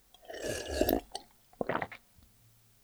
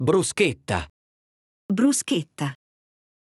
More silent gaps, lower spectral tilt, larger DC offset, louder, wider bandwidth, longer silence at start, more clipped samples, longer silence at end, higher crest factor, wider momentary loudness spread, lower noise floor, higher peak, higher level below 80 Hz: second, none vs 0.90-1.69 s; about the same, -4 dB/octave vs -4.5 dB/octave; neither; second, -36 LUFS vs -24 LUFS; first, over 20 kHz vs 13.5 kHz; first, 0.25 s vs 0 s; neither; about the same, 0.85 s vs 0.85 s; first, 26 dB vs 20 dB; first, 16 LU vs 11 LU; second, -64 dBFS vs under -90 dBFS; second, -10 dBFS vs -6 dBFS; about the same, -50 dBFS vs -54 dBFS